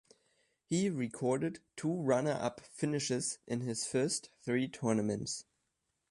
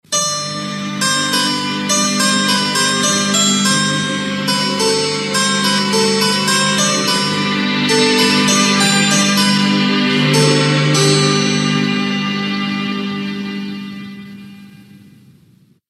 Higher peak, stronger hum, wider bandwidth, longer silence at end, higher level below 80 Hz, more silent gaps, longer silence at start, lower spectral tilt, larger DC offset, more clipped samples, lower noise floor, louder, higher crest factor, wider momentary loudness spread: second, -18 dBFS vs 0 dBFS; neither; second, 11.5 kHz vs 14.5 kHz; second, 0.7 s vs 0.95 s; second, -72 dBFS vs -66 dBFS; neither; first, 0.7 s vs 0.1 s; first, -5 dB/octave vs -3 dB/octave; neither; neither; first, -83 dBFS vs -50 dBFS; second, -35 LUFS vs -14 LUFS; about the same, 18 dB vs 16 dB; second, 7 LU vs 10 LU